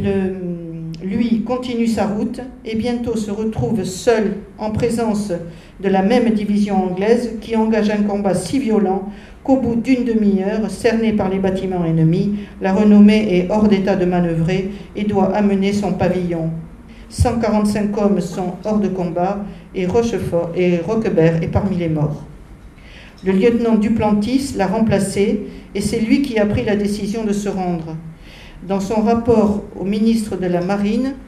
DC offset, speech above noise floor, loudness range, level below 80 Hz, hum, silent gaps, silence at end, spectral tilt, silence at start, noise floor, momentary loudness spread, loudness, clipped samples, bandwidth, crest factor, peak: under 0.1%; 22 dB; 5 LU; -38 dBFS; none; none; 0 s; -7 dB/octave; 0 s; -39 dBFS; 9 LU; -18 LUFS; under 0.1%; 13 kHz; 16 dB; 0 dBFS